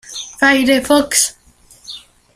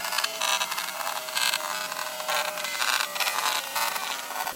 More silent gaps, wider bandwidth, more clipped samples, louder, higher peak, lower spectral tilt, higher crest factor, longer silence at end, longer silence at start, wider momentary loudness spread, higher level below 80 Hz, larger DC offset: neither; about the same, 15.5 kHz vs 17 kHz; neither; first, -13 LUFS vs -27 LUFS; first, 0 dBFS vs -8 dBFS; first, -1 dB/octave vs 1.5 dB/octave; second, 16 dB vs 22 dB; first, 0.35 s vs 0 s; about the same, 0.1 s vs 0 s; first, 21 LU vs 6 LU; first, -48 dBFS vs -76 dBFS; neither